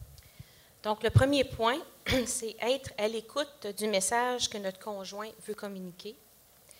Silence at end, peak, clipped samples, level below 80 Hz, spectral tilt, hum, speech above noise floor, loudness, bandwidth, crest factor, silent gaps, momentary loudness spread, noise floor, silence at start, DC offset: 0.65 s; -10 dBFS; under 0.1%; -52 dBFS; -4 dB/octave; none; 27 dB; -31 LUFS; 16 kHz; 22 dB; none; 14 LU; -58 dBFS; 0 s; under 0.1%